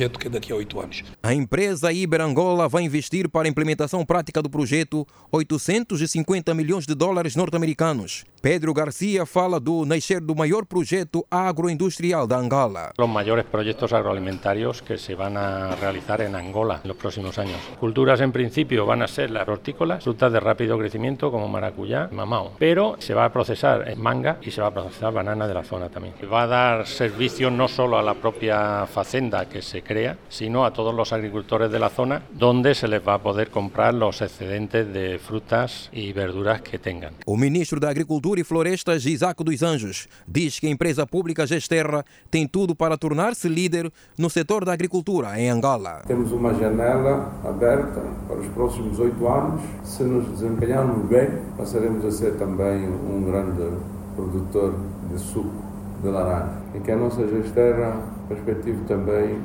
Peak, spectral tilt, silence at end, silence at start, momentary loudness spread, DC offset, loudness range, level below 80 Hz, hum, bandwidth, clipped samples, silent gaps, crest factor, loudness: -4 dBFS; -6 dB/octave; 0 s; 0 s; 9 LU; under 0.1%; 3 LU; -46 dBFS; none; over 20 kHz; under 0.1%; none; 20 dB; -23 LUFS